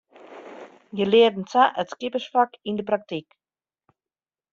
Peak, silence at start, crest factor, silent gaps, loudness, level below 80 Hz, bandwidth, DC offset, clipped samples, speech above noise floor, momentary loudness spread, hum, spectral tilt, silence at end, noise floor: -6 dBFS; 0.3 s; 20 dB; none; -22 LUFS; -70 dBFS; 7.2 kHz; under 0.1%; under 0.1%; over 68 dB; 24 LU; none; -2.5 dB/octave; 1.3 s; under -90 dBFS